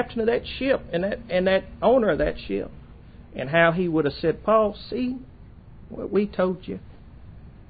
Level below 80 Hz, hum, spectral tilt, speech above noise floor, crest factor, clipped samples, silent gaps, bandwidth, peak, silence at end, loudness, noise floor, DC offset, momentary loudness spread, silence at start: -44 dBFS; none; -10.5 dB/octave; 22 dB; 18 dB; under 0.1%; none; 5 kHz; -6 dBFS; 0.05 s; -24 LUFS; -45 dBFS; under 0.1%; 16 LU; 0 s